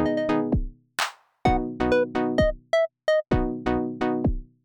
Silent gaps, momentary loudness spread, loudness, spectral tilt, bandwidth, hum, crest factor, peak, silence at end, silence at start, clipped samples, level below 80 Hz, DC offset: none; 6 LU; -25 LUFS; -6 dB/octave; over 20 kHz; none; 16 dB; -8 dBFS; 0.2 s; 0 s; under 0.1%; -36 dBFS; under 0.1%